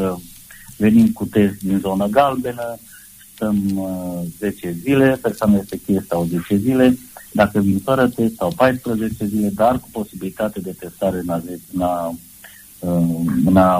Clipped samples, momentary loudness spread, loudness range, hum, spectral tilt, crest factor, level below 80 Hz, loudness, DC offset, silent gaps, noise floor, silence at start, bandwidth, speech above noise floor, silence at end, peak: under 0.1%; 14 LU; 4 LU; none; -7 dB/octave; 16 dB; -46 dBFS; -19 LUFS; under 0.1%; none; -42 dBFS; 0 s; 15.5 kHz; 24 dB; 0 s; -2 dBFS